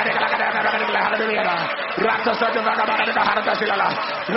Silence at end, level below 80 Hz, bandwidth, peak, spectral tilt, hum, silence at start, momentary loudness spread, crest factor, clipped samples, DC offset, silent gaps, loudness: 0 s; -60 dBFS; 6 kHz; -6 dBFS; -0.5 dB/octave; none; 0 s; 3 LU; 16 dB; under 0.1%; under 0.1%; none; -20 LUFS